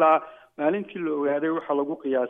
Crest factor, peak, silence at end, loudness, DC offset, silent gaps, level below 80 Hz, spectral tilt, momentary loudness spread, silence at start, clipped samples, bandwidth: 16 dB; -8 dBFS; 0 s; -26 LUFS; under 0.1%; none; -76 dBFS; -8.5 dB/octave; 5 LU; 0 s; under 0.1%; 3.8 kHz